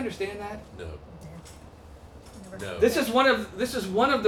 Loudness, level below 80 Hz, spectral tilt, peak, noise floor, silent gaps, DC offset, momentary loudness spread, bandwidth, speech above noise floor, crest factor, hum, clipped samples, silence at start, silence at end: -25 LUFS; -52 dBFS; -4.5 dB/octave; -8 dBFS; -47 dBFS; none; under 0.1%; 25 LU; 18 kHz; 21 dB; 18 dB; none; under 0.1%; 0 s; 0 s